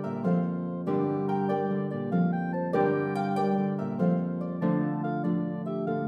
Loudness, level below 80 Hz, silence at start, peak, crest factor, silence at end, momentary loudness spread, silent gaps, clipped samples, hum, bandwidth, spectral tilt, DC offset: -28 LUFS; -74 dBFS; 0 s; -12 dBFS; 16 dB; 0 s; 4 LU; none; under 0.1%; none; 5 kHz; -10 dB/octave; under 0.1%